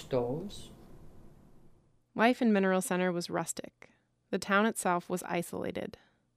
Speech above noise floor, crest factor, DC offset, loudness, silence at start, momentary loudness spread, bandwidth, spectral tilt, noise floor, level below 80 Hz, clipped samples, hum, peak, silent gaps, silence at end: 30 dB; 20 dB; under 0.1%; -31 LUFS; 0 s; 18 LU; 15.5 kHz; -5 dB/octave; -61 dBFS; -60 dBFS; under 0.1%; none; -14 dBFS; none; 0.45 s